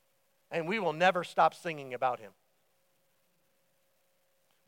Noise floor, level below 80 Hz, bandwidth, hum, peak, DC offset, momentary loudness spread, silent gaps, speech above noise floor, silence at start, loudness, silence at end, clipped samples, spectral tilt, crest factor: -75 dBFS; under -90 dBFS; 16.5 kHz; none; -12 dBFS; under 0.1%; 11 LU; none; 44 dB; 0.5 s; -31 LUFS; 2.4 s; under 0.1%; -5 dB/octave; 24 dB